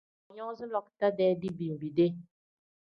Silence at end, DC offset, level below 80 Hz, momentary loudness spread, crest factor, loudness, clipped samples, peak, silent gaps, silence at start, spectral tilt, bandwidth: 0.7 s; under 0.1%; -72 dBFS; 14 LU; 18 dB; -31 LUFS; under 0.1%; -14 dBFS; none; 0.3 s; -9.5 dB/octave; 5.6 kHz